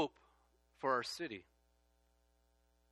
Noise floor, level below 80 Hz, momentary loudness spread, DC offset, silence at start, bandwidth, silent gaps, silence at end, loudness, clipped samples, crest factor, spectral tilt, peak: -75 dBFS; -76 dBFS; 10 LU; under 0.1%; 0 s; 13 kHz; none; 1.5 s; -40 LUFS; under 0.1%; 22 dB; -3.5 dB/octave; -22 dBFS